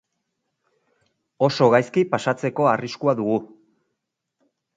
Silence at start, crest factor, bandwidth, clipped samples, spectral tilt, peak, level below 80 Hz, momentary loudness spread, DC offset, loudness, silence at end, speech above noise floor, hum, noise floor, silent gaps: 1.4 s; 20 dB; 9.2 kHz; under 0.1%; -6.5 dB/octave; -2 dBFS; -68 dBFS; 7 LU; under 0.1%; -21 LUFS; 1.3 s; 60 dB; none; -80 dBFS; none